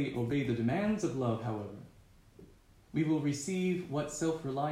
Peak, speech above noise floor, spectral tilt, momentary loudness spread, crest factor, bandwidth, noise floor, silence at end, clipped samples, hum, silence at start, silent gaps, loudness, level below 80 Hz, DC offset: -18 dBFS; 27 dB; -6.5 dB/octave; 8 LU; 16 dB; 15.5 kHz; -60 dBFS; 0 s; under 0.1%; none; 0 s; none; -34 LUFS; -62 dBFS; under 0.1%